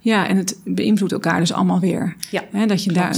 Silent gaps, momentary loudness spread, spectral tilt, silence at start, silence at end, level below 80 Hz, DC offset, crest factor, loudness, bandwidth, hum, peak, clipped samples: none; 6 LU; -5.5 dB/octave; 0.05 s; 0 s; -62 dBFS; under 0.1%; 16 dB; -19 LUFS; over 20 kHz; none; -4 dBFS; under 0.1%